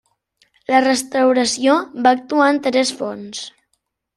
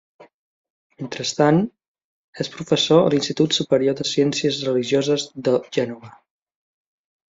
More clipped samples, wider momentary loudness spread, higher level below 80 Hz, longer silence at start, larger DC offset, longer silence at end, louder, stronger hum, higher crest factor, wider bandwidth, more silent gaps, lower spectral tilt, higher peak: neither; about the same, 15 LU vs 13 LU; about the same, -64 dBFS vs -62 dBFS; first, 0.7 s vs 0.2 s; neither; second, 0.65 s vs 1.2 s; first, -17 LUFS vs -20 LUFS; neither; about the same, 16 dB vs 18 dB; first, 13 kHz vs 7.8 kHz; second, none vs 0.34-0.64 s, 0.70-0.90 s, 1.88-1.95 s, 2.04-2.33 s; second, -2.5 dB/octave vs -5 dB/octave; about the same, -2 dBFS vs -4 dBFS